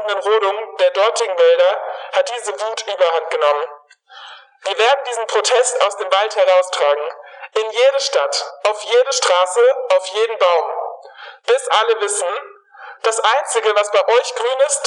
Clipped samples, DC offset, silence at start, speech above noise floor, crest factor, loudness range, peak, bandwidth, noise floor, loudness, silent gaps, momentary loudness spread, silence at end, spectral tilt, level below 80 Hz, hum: under 0.1%; under 0.1%; 0 s; 23 dB; 14 dB; 3 LU; -2 dBFS; 11.5 kHz; -39 dBFS; -16 LUFS; none; 10 LU; 0 s; 3 dB/octave; under -90 dBFS; none